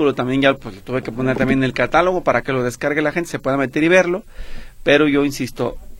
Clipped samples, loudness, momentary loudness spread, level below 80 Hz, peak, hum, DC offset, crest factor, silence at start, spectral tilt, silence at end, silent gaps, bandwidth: under 0.1%; -18 LUFS; 10 LU; -38 dBFS; 0 dBFS; none; under 0.1%; 18 dB; 0 s; -5.5 dB/octave; 0 s; none; 16.5 kHz